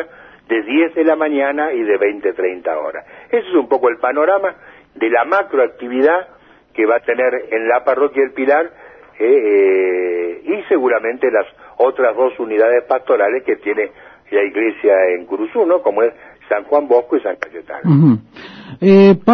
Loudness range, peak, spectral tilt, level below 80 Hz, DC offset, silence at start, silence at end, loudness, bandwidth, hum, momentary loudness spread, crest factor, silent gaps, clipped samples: 2 LU; 0 dBFS; -9.5 dB/octave; -60 dBFS; under 0.1%; 0 s; 0 s; -15 LUFS; 5.8 kHz; none; 9 LU; 14 dB; none; under 0.1%